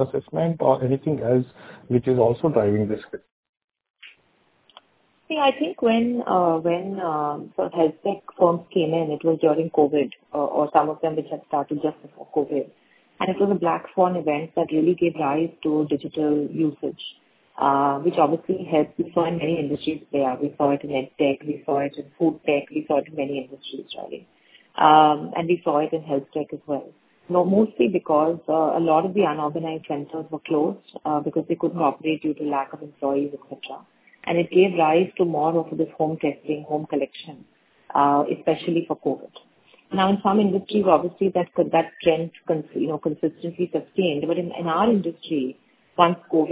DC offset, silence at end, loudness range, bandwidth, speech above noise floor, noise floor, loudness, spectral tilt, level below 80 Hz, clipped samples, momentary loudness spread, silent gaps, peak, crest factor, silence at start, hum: under 0.1%; 0 s; 4 LU; 4 kHz; 41 dB; -63 dBFS; -23 LUFS; -11 dB/octave; -62 dBFS; under 0.1%; 11 LU; 3.32-3.43 s, 3.49-3.53 s, 3.90-3.94 s; 0 dBFS; 22 dB; 0 s; none